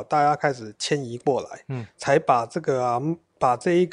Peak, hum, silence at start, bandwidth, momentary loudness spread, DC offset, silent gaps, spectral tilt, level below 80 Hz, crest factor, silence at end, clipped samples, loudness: -6 dBFS; none; 0 s; 11 kHz; 10 LU; under 0.1%; none; -5.5 dB/octave; -64 dBFS; 18 dB; 0 s; under 0.1%; -24 LUFS